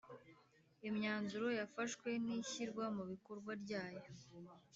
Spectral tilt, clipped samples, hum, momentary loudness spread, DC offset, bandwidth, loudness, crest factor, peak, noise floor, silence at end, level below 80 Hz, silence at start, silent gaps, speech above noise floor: -4 dB/octave; under 0.1%; none; 17 LU; under 0.1%; 8 kHz; -44 LUFS; 18 dB; -28 dBFS; -72 dBFS; 0.15 s; -84 dBFS; 0.05 s; none; 27 dB